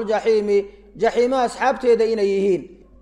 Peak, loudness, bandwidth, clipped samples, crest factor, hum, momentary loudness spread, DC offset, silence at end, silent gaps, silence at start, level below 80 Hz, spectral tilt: -6 dBFS; -19 LUFS; 10.5 kHz; under 0.1%; 14 dB; none; 5 LU; under 0.1%; 0.3 s; none; 0 s; -52 dBFS; -5.5 dB/octave